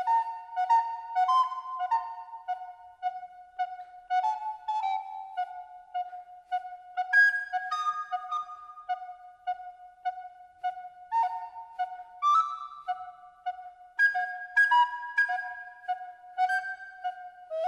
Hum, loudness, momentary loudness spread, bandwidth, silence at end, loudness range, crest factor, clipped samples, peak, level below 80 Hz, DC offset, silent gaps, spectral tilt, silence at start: none; -30 LUFS; 16 LU; 11.5 kHz; 0 s; 8 LU; 18 dB; under 0.1%; -14 dBFS; -78 dBFS; under 0.1%; none; 1.5 dB/octave; 0 s